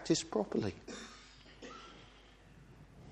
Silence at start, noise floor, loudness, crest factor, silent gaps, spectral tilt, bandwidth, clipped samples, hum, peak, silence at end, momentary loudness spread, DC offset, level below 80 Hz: 0 s; -60 dBFS; -39 LUFS; 24 dB; none; -4.5 dB/octave; 10.5 kHz; under 0.1%; none; -18 dBFS; 0 s; 25 LU; under 0.1%; -64 dBFS